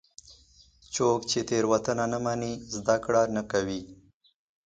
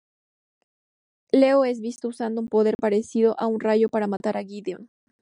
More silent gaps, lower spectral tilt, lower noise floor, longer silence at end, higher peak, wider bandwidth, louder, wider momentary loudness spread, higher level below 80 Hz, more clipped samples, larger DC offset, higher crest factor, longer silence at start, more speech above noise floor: second, none vs 2.75-2.79 s; second, -4.5 dB/octave vs -6.5 dB/octave; second, -58 dBFS vs under -90 dBFS; first, 0.75 s vs 0.45 s; second, -10 dBFS vs -6 dBFS; second, 9.6 kHz vs 11 kHz; second, -28 LUFS vs -23 LUFS; second, 9 LU vs 13 LU; first, -58 dBFS vs -70 dBFS; neither; neither; about the same, 20 dB vs 18 dB; second, 0.3 s vs 1.35 s; second, 31 dB vs over 68 dB